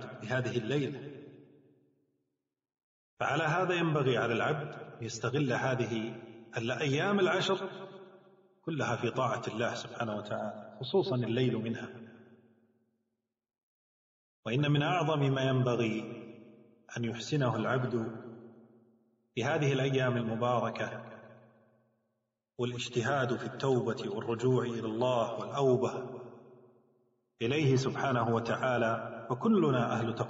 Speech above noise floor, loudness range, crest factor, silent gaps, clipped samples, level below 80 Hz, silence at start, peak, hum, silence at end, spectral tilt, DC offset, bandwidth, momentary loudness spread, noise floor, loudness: 56 dB; 5 LU; 18 dB; 2.83-3.17 s, 13.63-14.43 s; under 0.1%; -72 dBFS; 0 s; -16 dBFS; none; 0 s; -5 dB/octave; under 0.1%; 7.6 kHz; 15 LU; -87 dBFS; -32 LUFS